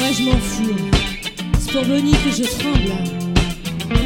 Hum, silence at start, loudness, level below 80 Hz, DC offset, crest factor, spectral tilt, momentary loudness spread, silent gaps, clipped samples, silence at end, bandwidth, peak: none; 0 s; -19 LUFS; -24 dBFS; under 0.1%; 18 dB; -5 dB/octave; 7 LU; none; under 0.1%; 0 s; 17 kHz; 0 dBFS